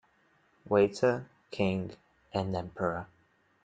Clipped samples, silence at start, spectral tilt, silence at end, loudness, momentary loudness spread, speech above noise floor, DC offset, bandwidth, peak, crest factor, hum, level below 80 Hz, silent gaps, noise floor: under 0.1%; 0.65 s; -7 dB/octave; 0.6 s; -31 LUFS; 15 LU; 39 dB; under 0.1%; 9.2 kHz; -14 dBFS; 20 dB; none; -64 dBFS; none; -69 dBFS